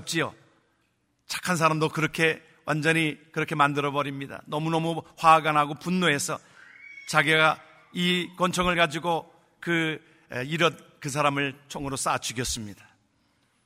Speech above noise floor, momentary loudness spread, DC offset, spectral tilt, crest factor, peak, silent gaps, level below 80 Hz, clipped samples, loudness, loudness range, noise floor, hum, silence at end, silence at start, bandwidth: 46 dB; 14 LU; under 0.1%; -4 dB/octave; 24 dB; -4 dBFS; none; -56 dBFS; under 0.1%; -25 LUFS; 4 LU; -71 dBFS; none; 0.9 s; 0 s; 16 kHz